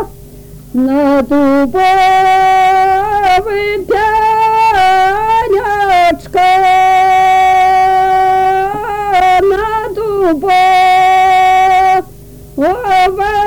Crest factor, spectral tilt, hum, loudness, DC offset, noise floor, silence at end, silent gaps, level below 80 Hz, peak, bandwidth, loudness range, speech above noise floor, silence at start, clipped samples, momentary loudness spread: 4 dB; -4.5 dB/octave; none; -10 LUFS; under 0.1%; -33 dBFS; 0 s; none; -36 dBFS; -6 dBFS; 19.5 kHz; 1 LU; 24 dB; 0 s; under 0.1%; 7 LU